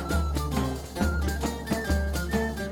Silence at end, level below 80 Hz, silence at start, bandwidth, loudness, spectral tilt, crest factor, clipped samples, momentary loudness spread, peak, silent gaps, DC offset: 0 s; -32 dBFS; 0 s; 18 kHz; -29 LUFS; -5.5 dB/octave; 14 dB; under 0.1%; 3 LU; -12 dBFS; none; under 0.1%